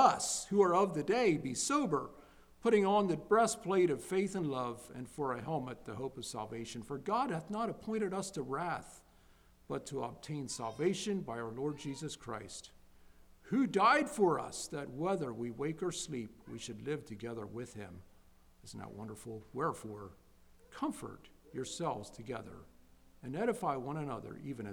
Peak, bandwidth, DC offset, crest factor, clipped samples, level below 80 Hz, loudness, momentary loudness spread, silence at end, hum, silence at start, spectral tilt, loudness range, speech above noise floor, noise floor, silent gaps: -14 dBFS; 16.5 kHz; under 0.1%; 22 dB; under 0.1%; -66 dBFS; -36 LUFS; 17 LU; 0 s; none; 0 s; -4.5 dB/octave; 12 LU; 28 dB; -64 dBFS; none